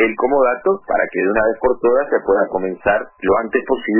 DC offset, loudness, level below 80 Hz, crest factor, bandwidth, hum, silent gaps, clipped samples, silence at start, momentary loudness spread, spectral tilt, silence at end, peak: under 0.1%; -17 LUFS; -44 dBFS; 14 dB; 3.1 kHz; none; none; under 0.1%; 0 s; 4 LU; -10 dB/octave; 0 s; -4 dBFS